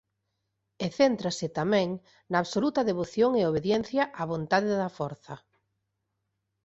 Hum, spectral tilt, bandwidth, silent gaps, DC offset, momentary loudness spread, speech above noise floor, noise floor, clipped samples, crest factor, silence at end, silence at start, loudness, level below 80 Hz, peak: none; -5.5 dB/octave; 8.2 kHz; none; under 0.1%; 11 LU; 53 dB; -81 dBFS; under 0.1%; 20 dB; 1.3 s; 0.8 s; -28 LUFS; -64 dBFS; -10 dBFS